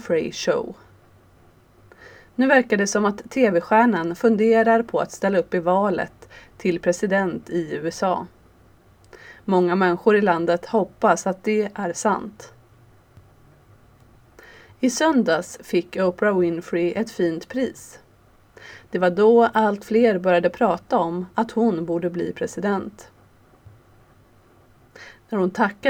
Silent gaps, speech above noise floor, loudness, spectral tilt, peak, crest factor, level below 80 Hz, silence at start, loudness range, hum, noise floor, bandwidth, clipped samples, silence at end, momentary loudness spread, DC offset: none; 34 dB; -21 LUFS; -5.5 dB/octave; -2 dBFS; 20 dB; -60 dBFS; 0 s; 8 LU; none; -54 dBFS; 17 kHz; under 0.1%; 0 s; 10 LU; under 0.1%